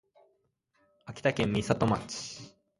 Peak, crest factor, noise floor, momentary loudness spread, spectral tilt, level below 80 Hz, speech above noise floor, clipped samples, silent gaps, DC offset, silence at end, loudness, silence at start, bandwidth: -10 dBFS; 22 dB; -74 dBFS; 16 LU; -5.5 dB/octave; -56 dBFS; 44 dB; under 0.1%; none; under 0.1%; 0.3 s; -30 LUFS; 1.05 s; 11.5 kHz